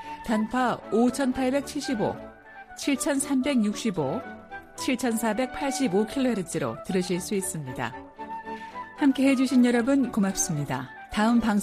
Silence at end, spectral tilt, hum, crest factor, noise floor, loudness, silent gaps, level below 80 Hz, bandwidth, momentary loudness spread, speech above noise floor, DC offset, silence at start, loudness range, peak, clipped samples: 0 s; -4.5 dB/octave; none; 14 dB; -46 dBFS; -26 LUFS; none; -54 dBFS; 15 kHz; 15 LU; 21 dB; under 0.1%; 0 s; 3 LU; -12 dBFS; under 0.1%